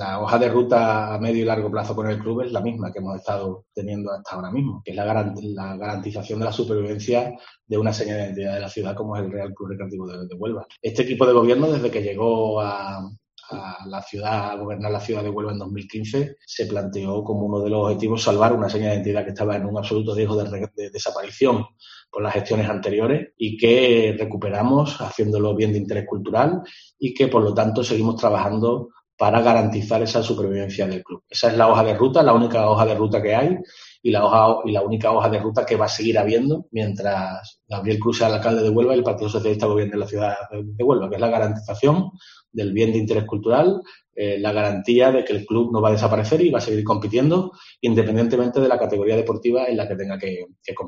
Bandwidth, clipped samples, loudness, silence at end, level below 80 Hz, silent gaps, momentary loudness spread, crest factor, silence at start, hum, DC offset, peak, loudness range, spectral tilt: 7.6 kHz; under 0.1%; -21 LUFS; 0 s; -58 dBFS; 29.13-29.18 s; 13 LU; 20 dB; 0 s; none; under 0.1%; 0 dBFS; 8 LU; -6.5 dB/octave